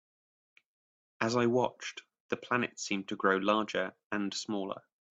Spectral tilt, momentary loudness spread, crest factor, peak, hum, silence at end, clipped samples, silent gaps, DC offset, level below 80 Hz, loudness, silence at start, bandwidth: -4.5 dB/octave; 13 LU; 22 dB; -12 dBFS; none; 0.4 s; under 0.1%; 2.20-2.29 s, 4.06-4.10 s; under 0.1%; -76 dBFS; -33 LUFS; 1.2 s; 8.4 kHz